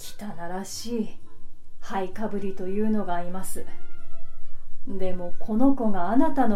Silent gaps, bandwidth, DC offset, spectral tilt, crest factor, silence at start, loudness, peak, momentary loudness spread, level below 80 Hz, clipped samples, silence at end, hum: none; 13 kHz; under 0.1%; -6 dB/octave; 14 dB; 0 s; -28 LUFS; -6 dBFS; 17 LU; -36 dBFS; under 0.1%; 0 s; none